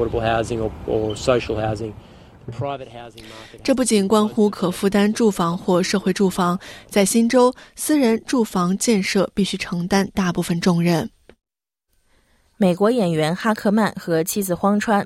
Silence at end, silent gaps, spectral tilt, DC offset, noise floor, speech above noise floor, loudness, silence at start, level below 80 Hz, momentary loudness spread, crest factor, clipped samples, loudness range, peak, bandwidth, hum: 0 s; none; -5 dB/octave; under 0.1%; -73 dBFS; 53 dB; -20 LUFS; 0 s; -46 dBFS; 11 LU; 18 dB; under 0.1%; 4 LU; -2 dBFS; 16 kHz; none